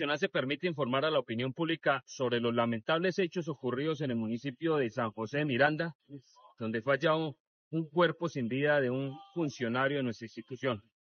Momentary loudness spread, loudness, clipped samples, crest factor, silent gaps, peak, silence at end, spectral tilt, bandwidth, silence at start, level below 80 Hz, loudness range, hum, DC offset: 10 LU; -32 LUFS; under 0.1%; 20 dB; 5.95-6.00 s, 7.40-7.71 s; -12 dBFS; 0.35 s; -4 dB/octave; 6.6 kHz; 0 s; -78 dBFS; 1 LU; none; under 0.1%